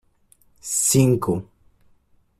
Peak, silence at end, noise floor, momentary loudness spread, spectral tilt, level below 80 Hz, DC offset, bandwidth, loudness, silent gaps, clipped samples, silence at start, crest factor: -4 dBFS; 0.95 s; -59 dBFS; 12 LU; -5 dB/octave; -54 dBFS; under 0.1%; 15.5 kHz; -20 LUFS; none; under 0.1%; 0.65 s; 20 dB